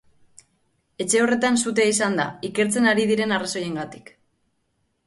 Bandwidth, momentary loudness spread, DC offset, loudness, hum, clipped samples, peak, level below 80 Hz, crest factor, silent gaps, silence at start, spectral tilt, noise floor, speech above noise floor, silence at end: 11.5 kHz; 11 LU; under 0.1%; -21 LUFS; none; under 0.1%; -8 dBFS; -66 dBFS; 16 dB; none; 1 s; -3.5 dB/octave; -71 dBFS; 49 dB; 1.05 s